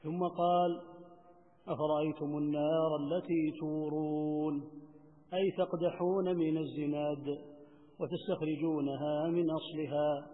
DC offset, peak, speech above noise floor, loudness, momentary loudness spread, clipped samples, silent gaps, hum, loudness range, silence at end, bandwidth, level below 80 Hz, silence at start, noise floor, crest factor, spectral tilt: under 0.1%; -20 dBFS; 28 dB; -34 LUFS; 10 LU; under 0.1%; none; none; 2 LU; 0 s; 3.9 kHz; -78 dBFS; 0.05 s; -62 dBFS; 16 dB; -6 dB/octave